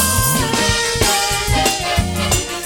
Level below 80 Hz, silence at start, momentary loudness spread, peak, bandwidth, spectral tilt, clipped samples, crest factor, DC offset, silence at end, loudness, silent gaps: -28 dBFS; 0 s; 3 LU; -2 dBFS; 17.5 kHz; -2.5 dB/octave; under 0.1%; 14 dB; under 0.1%; 0 s; -15 LUFS; none